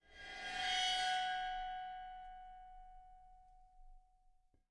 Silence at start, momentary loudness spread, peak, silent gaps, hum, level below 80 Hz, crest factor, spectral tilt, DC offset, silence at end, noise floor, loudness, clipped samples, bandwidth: 0.05 s; 24 LU; -26 dBFS; none; none; -62 dBFS; 18 dB; 0.5 dB/octave; under 0.1%; 0.7 s; -71 dBFS; -39 LUFS; under 0.1%; 11.5 kHz